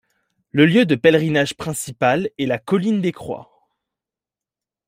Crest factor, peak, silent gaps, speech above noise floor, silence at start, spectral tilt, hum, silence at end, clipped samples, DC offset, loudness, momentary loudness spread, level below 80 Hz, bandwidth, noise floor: 18 dB; -2 dBFS; none; 71 dB; 0.55 s; -5.5 dB/octave; none; 1.45 s; under 0.1%; under 0.1%; -18 LUFS; 12 LU; -58 dBFS; 16 kHz; -89 dBFS